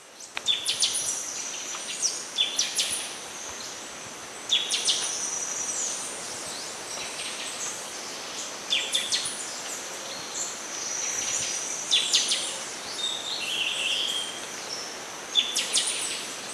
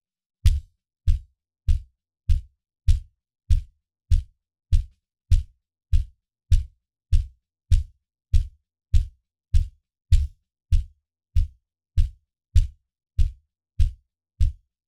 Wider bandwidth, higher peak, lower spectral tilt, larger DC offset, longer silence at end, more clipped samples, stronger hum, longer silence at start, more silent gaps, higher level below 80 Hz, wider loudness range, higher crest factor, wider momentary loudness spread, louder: first, 12 kHz vs 9.8 kHz; second, -8 dBFS vs -4 dBFS; second, 1.5 dB/octave vs -5.5 dB/octave; neither; second, 0 s vs 0.35 s; neither; neither; second, 0 s vs 0.45 s; neither; second, -70 dBFS vs -24 dBFS; first, 4 LU vs 1 LU; about the same, 22 dB vs 20 dB; about the same, 11 LU vs 10 LU; about the same, -27 LUFS vs -28 LUFS